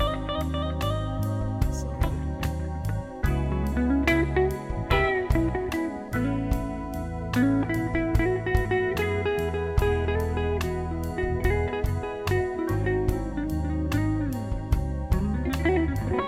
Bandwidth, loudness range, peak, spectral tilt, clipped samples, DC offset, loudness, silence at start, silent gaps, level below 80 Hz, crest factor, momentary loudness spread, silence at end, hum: 15.5 kHz; 2 LU; -8 dBFS; -7 dB/octave; under 0.1%; 0.1%; -27 LUFS; 0 s; none; -32 dBFS; 16 dB; 6 LU; 0 s; none